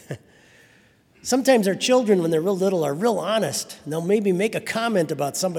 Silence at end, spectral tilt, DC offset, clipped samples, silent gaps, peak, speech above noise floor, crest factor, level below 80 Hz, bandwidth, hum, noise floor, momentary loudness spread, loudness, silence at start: 0 s; -4.5 dB/octave; under 0.1%; under 0.1%; none; -4 dBFS; 35 dB; 18 dB; -68 dBFS; 18 kHz; none; -56 dBFS; 10 LU; -21 LUFS; 0.1 s